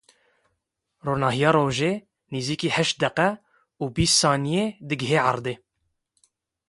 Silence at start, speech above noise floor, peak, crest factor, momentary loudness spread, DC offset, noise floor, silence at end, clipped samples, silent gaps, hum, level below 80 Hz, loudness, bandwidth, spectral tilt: 1.05 s; 55 dB; -6 dBFS; 20 dB; 14 LU; under 0.1%; -78 dBFS; 1.15 s; under 0.1%; none; none; -50 dBFS; -23 LUFS; 11.5 kHz; -4 dB/octave